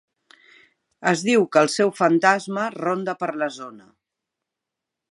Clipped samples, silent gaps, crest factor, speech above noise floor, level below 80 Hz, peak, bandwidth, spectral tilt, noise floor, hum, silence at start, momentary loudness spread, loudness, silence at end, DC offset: under 0.1%; none; 22 dB; 64 dB; -76 dBFS; -2 dBFS; 11.5 kHz; -4.5 dB/octave; -85 dBFS; none; 1 s; 10 LU; -21 LUFS; 1.35 s; under 0.1%